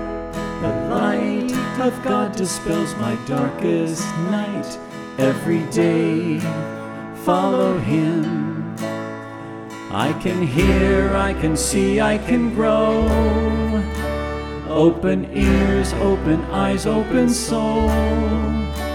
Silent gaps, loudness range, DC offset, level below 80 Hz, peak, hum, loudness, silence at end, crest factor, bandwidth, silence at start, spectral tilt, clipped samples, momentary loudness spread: none; 4 LU; under 0.1%; -30 dBFS; -2 dBFS; none; -20 LUFS; 0 s; 16 dB; 17 kHz; 0 s; -6 dB/octave; under 0.1%; 10 LU